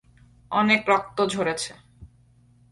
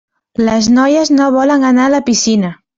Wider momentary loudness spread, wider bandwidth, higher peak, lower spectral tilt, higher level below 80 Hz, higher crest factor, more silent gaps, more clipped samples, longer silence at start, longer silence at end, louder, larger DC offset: first, 10 LU vs 5 LU; first, 11.5 kHz vs 7.8 kHz; second, -6 dBFS vs -2 dBFS; about the same, -4 dB/octave vs -4 dB/octave; second, -58 dBFS vs -46 dBFS; first, 20 dB vs 10 dB; neither; neither; about the same, 0.5 s vs 0.4 s; first, 0.65 s vs 0.25 s; second, -23 LUFS vs -11 LUFS; neither